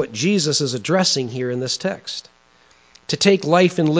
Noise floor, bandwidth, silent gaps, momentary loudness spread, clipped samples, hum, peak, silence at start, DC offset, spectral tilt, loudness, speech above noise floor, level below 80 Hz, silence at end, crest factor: -54 dBFS; 8 kHz; none; 13 LU; under 0.1%; none; -2 dBFS; 0 s; under 0.1%; -4.5 dB/octave; -19 LUFS; 35 dB; -64 dBFS; 0 s; 18 dB